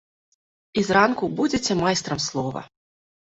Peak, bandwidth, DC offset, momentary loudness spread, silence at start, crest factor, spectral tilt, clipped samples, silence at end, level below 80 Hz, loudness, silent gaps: -4 dBFS; 8.4 kHz; under 0.1%; 11 LU; 0.75 s; 22 dB; -4 dB/octave; under 0.1%; 0.7 s; -54 dBFS; -22 LUFS; none